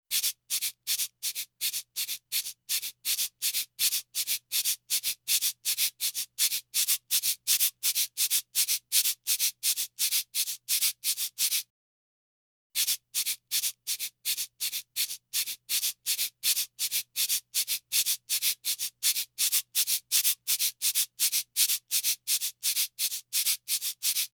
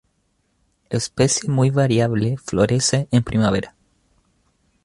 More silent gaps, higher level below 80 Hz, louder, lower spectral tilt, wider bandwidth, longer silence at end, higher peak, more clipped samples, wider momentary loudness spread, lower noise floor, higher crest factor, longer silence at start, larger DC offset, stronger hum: first, 11.70-12.70 s vs none; second, -82 dBFS vs -46 dBFS; second, -27 LUFS vs -19 LUFS; second, 5 dB/octave vs -5 dB/octave; first, over 20 kHz vs 11.5 kHz; second, 0.1 s vs 1.15 s; second, -8 dBFS vs -2 dBFS; neither; about the same, 6 LU vs 8 LU; first, under -90 dBFS vs -67 dBFS; about the same, 22 dB vs 18 dB; second, 0.1 s vs 0.9 s; neither; neither